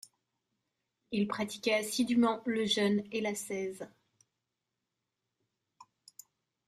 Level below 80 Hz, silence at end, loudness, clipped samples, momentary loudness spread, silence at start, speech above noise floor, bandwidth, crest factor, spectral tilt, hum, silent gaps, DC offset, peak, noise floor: -76 dBFS; 0.85 s; -32 LUFS; under 0.1%; 10 LU; 1.1 s; 55 dB; 15 kHz; 18 dB; -4 dB/octave; none; none; under 0.1%; -18 dBFS; -87 dBFS